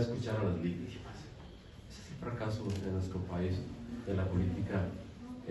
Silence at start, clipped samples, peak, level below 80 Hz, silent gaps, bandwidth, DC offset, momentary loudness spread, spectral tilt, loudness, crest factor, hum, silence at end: 0 s; under 0.1%; -20 dBFS; -54 dBFS; none; 11.5 kHz; under 0.1%; 16 LU; -7.5 dB/octave; -38 LUFS; 18 dB; none; 0 s